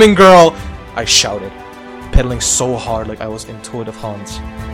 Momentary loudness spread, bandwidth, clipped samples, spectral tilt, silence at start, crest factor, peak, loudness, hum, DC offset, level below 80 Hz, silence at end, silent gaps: 22 LU; over 20 kHz; 2%; -3.5 dB/octave; 0 s; 14 dB; 0 dBFS; -11 LUFS; none; under 0.1%; -26 dBFS; 0 s; none